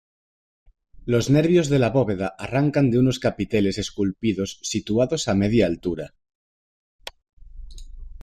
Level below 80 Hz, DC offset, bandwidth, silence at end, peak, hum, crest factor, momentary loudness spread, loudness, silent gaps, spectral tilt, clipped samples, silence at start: -44 dBFS; under 0.1%; 13.5 kHz; 0 s; -6 dBFS; none; 16 dB; 16 LU; -22 LUFS; 6.35-6.99 s, 7.33-7.37 s; -6 dB/octave; under 0.1%; 1 s